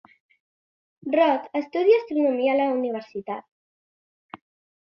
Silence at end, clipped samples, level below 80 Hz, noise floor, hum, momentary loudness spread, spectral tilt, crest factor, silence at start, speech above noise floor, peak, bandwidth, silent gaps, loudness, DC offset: 0.5 s; under 0.1%; -76 dBFS; under -90 dBFS; none; 14 LU; -7 dB/octave; 18 dB; 1.05 s; over 68 dB; -8 dBFS; 6 kHz; 3.48-4.29 s; -23 LUFS; under 0.1%